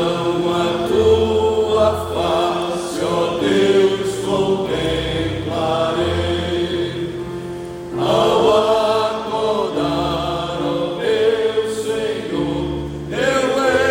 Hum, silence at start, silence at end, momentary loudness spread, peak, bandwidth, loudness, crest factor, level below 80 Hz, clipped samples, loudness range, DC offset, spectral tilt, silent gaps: none; 0 s; 0 s; 8 LU; -4 dBFS; 16.5 kHz; -18 LUFS; 14 dB; -40 dBFS; under 0.1%; 3 LU; under 0.1%; -5.5 dB/octave; none